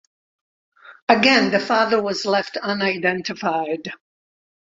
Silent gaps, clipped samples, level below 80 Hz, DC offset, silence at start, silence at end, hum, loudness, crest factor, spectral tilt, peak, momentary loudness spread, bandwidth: 1.02-1.07 s; under 0.1%; -64 dBFS; under 0.1%; 0.85 s; 0.75 s; none; -19 LUFS; 20 dB; -4 dB/octave; 0 dBFS; 12 LU; 7.8 kHz